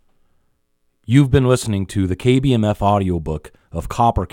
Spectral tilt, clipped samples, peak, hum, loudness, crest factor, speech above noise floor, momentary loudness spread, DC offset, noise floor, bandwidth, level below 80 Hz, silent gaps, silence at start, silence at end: -7 dB/octave; under 0.1%; 0 dBFS; none; -17 LUFS; 18 dB; 48 dB; 13 LU; under 0.1%; -65 dBFS; 16.5 kHz; -36 dBFS; none; 1.1 s; 0.05 s